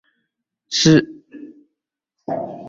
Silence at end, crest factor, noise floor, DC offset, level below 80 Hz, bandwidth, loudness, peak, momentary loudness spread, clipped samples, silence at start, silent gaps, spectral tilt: 0 s; 20 dB; -80 dBFS; under 0.1%; -54 dBFS; 7.8 kHz; -17 LUFS; -2 dBFS; 23 LU; under 0.1%; 0.7 s; none; -4.5 dB/octave